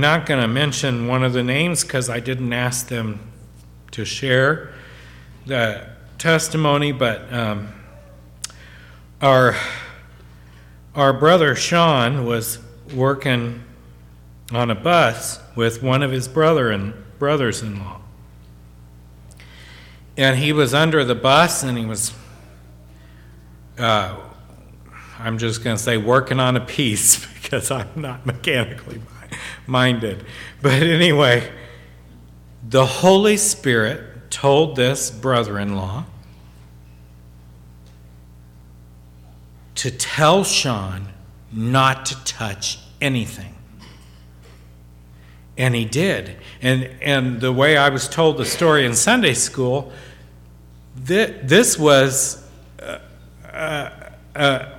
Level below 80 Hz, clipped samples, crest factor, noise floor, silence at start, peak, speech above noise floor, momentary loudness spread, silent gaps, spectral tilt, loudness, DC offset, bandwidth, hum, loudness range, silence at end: -46 dBFS; under 0.1%; 20 dB; -44 dBFS; 0 s; 0 dBFS; 26 dB; 20 LU; none; -4 dB/octave; -18 LUFS; under 0.1%; 17 kHz; 60 Hz at -45 dBFS; 8 LU; 0 s